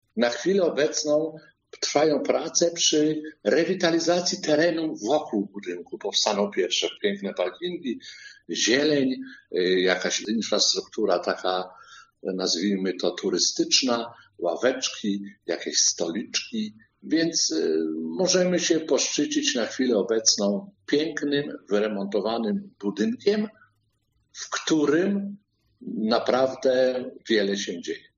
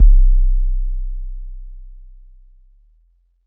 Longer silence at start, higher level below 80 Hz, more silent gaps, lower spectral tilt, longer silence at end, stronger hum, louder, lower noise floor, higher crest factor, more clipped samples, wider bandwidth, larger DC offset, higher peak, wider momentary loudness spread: first, 0.15 s vs 0 s; second, -74 dBFS vs -16 dBFS; neither; second, -3 dB/octave vs -16.5 dB/octave; second, 0.2 s vs 1.55 s; neither; second, -24 LUFS vs -21 LUFS; first, -70 dBFS vs -57 dBFS; first, 20 dB vs 14 dB; neither; first, 7.4 kHz vs 0.2 kHz; neither; second, -6 dBFS vs 0 dBFS; second, 11 LU vs 25 LU